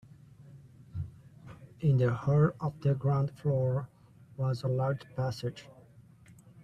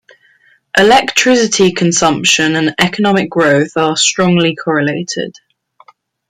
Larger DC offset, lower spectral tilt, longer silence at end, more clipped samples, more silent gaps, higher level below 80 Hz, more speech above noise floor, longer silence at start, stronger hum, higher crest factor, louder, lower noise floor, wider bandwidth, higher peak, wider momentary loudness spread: neither; first, -9 dB/octave vs -3.5 dB/octave; second, 0.6 s vs 1 s; neither; neither; second, -60 dBFS vs -50 dBFS; second, 27 dB vs 40 dB; second, 0.4 s vs 0.75 s; neither; first, 18 dB vs 12 dB; second, -31 LUFS vs -11 LUFS; first, -57 dBFS vs -51 dBFS; second, 8.6 kHz vs 15.5 kHz; second, -14 dBFS vs 0 dBFS; first, 22 LU vs 7 LU